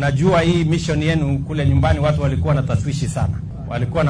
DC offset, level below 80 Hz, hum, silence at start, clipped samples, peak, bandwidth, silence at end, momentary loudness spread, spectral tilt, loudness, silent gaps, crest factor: under 0.1%; -30 dBFS; none; 0 s; under 0.1%; -2 dBFS; 10.5 kHz; 0 s; 7 LU; -7 dB/octave; -18 LUFS; none; 16 dB